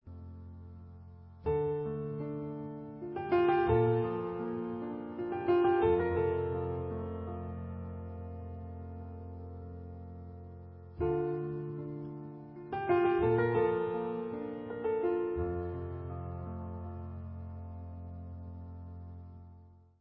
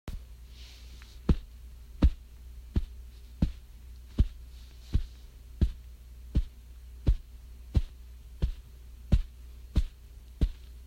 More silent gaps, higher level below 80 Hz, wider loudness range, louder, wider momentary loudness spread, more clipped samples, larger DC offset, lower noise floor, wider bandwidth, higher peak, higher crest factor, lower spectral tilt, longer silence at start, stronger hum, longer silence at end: neither; second, -50 dBFS vs -34 dBFS; first, 13 LU vs 2 LU; about the same, -34 LUFS vs -34 LUFS; about the same, 20 LU vs 19 LU; neither; neither; first, -57 dBFS vs -49 dBFS; second, 5 kHz vs 12 kHz; second, -16 dBFS vs -10 dBFS; about the same, 20 dB vs 22 dB; about the same, -7.5 dB/octave vs -8 dB/octave; about the same, 0.05 s vs 0.05 s; neither; first, 0.2 s vs 0 s